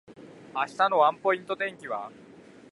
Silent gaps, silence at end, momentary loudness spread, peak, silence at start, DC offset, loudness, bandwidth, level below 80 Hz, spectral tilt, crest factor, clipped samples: none; 0.6 s; 14 LU; -10 dBFS; 0.1 s; under 0.1%; -27 LUFS; 11.5 kHz; -76 dBFS; -4.5 dB/octave; 20 dB; under 0.1%